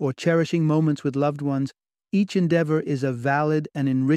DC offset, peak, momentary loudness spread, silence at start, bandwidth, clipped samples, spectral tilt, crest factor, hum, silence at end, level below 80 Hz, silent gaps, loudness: under 0.1%; -8 dBFS; 5 LU; 0 s; 9.8 kHz; under 0.1%; -7.5 dB/octave; 14 dB; none; 0 s; -66 dBFS; none; -23 LUFS